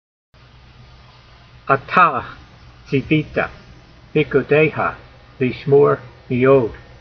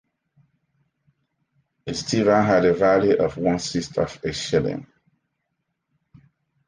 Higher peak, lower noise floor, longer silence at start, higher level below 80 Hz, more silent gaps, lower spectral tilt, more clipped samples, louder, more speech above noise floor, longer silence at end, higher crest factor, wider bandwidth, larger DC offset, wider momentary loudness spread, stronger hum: first, 0 dBFS vs -6 dBFS; second, -45 dBFS vs -77 dBFS; second, 1.65 s vs 1.85 s; first, -46 dBFS vs -52 dBFS; neither; about the same, -5.5 dB/octave vs -5.5 dB/octave; neither; first, -17 LUFS vs -21 LUFS; second, 29 dB vs 56 dB; second, 0.25 s vs 1.85 s; about the same, 20 dB vs 18 dB; second, 6 kHz vs 10 kHz; neither; about the same, 13 LU vs 12 LU; neither